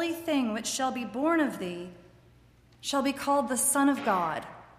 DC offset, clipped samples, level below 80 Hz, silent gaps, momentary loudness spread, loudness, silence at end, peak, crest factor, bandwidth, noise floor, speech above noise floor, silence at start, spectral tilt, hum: under 0.1%; under 0.1%; -64 dBFS; none; 13 LU; -28 LUFS; 0.15 s; -14 dBFS; 16 dB; 15.5 kHz; -59 dBFS; 30 dB; 0 s; -3 dB/octave; none